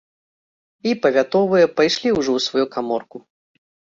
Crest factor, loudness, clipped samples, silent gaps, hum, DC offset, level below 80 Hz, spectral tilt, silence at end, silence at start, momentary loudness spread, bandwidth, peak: 16 dB; -19 LUFS; under 0.1%; none; none; under 0.1%; -60 dBFS; -4.5 dB/octave; 0.8 s; 0.85 s; 9 LU; 7.8 kHz; -4 dBFS